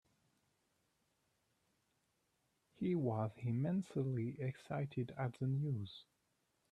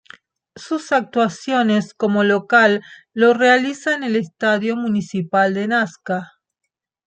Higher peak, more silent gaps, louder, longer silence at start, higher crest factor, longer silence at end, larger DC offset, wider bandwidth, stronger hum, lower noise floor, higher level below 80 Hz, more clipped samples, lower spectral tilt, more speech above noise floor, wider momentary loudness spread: second, -24 dBFS vs -2 dBFS; neither; second, -41 LUFS vs -18 LUFS; first, 2.8 s vs 0.55 s; about the same, 18 dB vs 18 dB; second, 0.7 s vs 0.85 s; neither; first, 10 kHz vs 9 kHz; neither; first, -82 dBFS vs -47 dBFS; second, -78 dBFS vs -68 dBFS; neither; first, -9 dB/octave vs -5.5 dB/octave; first, 43 dB vs 29 dB; second, 7 LU vs 11 LU